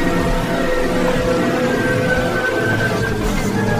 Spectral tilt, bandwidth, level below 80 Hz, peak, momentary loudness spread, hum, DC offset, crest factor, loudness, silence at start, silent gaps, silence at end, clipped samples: -5.5 dB/octave; 15.5 kHz; -26 dBFS; -4 dBFS; 2 LU; none; under 0.1%; 12 dB; -18 LUFS; 0 s; none; 0 s; under 0.1%